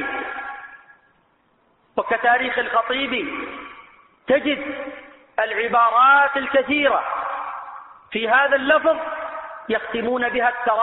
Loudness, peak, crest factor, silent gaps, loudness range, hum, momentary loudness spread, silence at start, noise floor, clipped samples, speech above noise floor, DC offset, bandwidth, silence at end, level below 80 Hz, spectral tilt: -20 LUFS; -4 dBFS; 16 dB; none; 5 LU; none; 17 LU; 0 s; -62 dBFS; under 0.1%; 43 dB; under 0.1%; 4.1 kHz; 0 s; -58 dBFS; 0 dB/octave